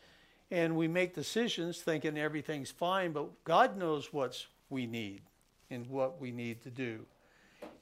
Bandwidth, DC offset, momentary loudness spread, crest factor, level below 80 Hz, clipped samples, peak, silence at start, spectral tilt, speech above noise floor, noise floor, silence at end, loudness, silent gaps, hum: 16 kHz; under 0.1%; 15 LU; 22 dB; -74 dBFS; under 0.1%; -14 dBFS; 0.5 s; -5 dB/octave; 29 dB; -64 dBFS; 0.05 s; -35 LUFS; none; none